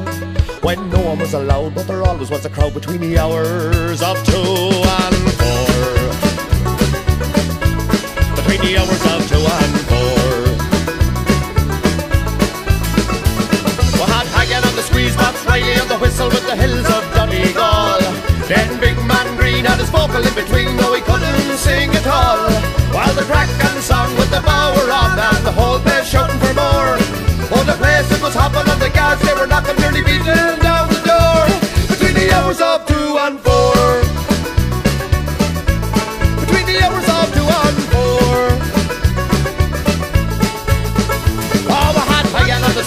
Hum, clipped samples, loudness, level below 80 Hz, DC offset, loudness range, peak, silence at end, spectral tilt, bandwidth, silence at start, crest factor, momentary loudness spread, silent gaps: none; under 0.1%; -14 LUFS; -22 dBFS; under 0.1%; 3 LU; 0 dBFS; 0 s; -5 dB/octave; 15.5 kHz; 0 s; 14 dB; 5 LU; none